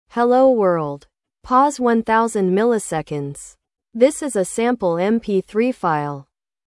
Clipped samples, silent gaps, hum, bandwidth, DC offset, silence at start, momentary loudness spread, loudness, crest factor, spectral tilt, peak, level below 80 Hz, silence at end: under 0.1%; none; none; 12 kHz; under 0.1%; 0.15 s; 14 LU; -18 LUFS; 16 dB; -5.5 dB/octave; -2 dBFS; -56 dBFS; 0.45 s